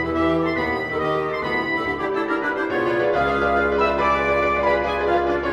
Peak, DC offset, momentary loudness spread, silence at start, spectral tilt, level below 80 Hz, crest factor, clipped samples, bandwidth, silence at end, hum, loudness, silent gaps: -6 dBFS; under 0.1%; 4 LU; 0 s; -6.5 dB/octave; -40 dBFS; 14 dB; under 0.1%; 10.5 kHz; 0 s; none; -21 LUFS; none